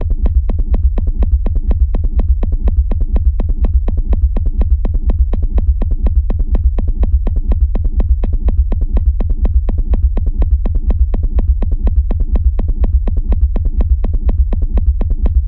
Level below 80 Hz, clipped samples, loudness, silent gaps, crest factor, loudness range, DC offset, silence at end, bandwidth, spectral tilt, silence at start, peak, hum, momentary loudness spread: -12 dBFS; under 0.1%; -17 LUFS; none; 10 dB; 0 LU; 0.2%; 0 s; 3.2 kHz; -11.5 dB/octave; 0 s; 0 dBFS; none; 2 LU